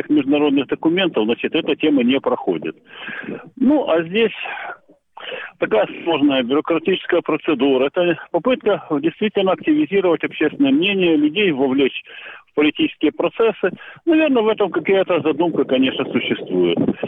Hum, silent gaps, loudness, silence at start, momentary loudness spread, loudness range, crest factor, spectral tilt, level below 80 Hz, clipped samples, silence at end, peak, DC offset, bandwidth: none; none; -18 LUFS; 0.05 s; 11 LU; 3 LU; 10 dB; -8.5 dB/octave; -60 dBFS; under 0.1%; 0 s; -8 dBFS; under 0.1%; 3.9 kHz